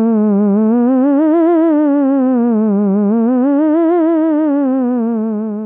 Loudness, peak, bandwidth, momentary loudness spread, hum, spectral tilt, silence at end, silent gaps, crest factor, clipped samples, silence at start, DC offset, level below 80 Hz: -13 LUFS; -4 dBFS; 3.4 kHz; 4 LU; none; -13 dB/octave; 0 s; none; 8 dB; under 0.1%; 0 s; under 0.1%; -76 dBFS